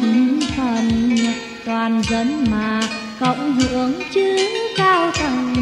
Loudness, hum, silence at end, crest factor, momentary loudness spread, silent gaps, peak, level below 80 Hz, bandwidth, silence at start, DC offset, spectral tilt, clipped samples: -18 LUFS; none; 0 s; 14 dB; 6 LU; none; -4 dBFS; -40 dBFS; 11 kHz; 0 s; under 0.1%; -4.5 dB/octave; under 0.1%